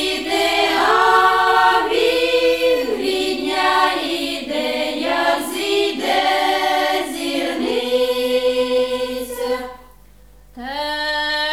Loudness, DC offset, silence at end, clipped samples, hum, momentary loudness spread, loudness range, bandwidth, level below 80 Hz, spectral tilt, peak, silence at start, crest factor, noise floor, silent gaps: -18 LUFS; 0.3%; 0 s; under 0.1%; none; 10 LU; 6 LU; 17 kHz; -50 dBFS; -2 dB/octave; -2 dBFS; 0 s; 16 dB; -47 dBFS; none